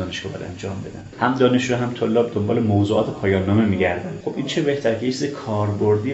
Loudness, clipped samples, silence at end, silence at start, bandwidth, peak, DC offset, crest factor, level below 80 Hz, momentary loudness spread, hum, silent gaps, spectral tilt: -21 LUFS; under 0.1%; 0 s; 0 s; 8 kHz; -4 dBFS; under 0.1%; 18 dB; -52 dBFS; 12 LU; none; none; -6 dB/octave